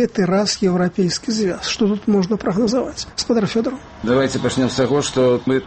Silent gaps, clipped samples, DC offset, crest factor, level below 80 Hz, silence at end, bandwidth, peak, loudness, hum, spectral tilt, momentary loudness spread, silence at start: none; under 0.1%; under 0.1%; 12 dB; -46 dBFS; 0 s; 8.8 kHz; -6 dBFS; -18 LUFS; none; -5 dB/octave; 5 LU; 0 s